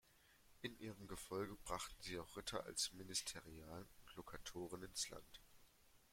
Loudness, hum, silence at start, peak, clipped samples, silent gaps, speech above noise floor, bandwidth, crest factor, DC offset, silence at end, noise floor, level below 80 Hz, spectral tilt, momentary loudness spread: -49 LUFS; none; 0.05 s; -28 dBFS; under 0.1%; none; 21 dB; 16.5 kHz; 22 dB; under 0.1%; 0 s; -72 dBFS; -68 dBFS; -2.5 dB/octave; 14 LU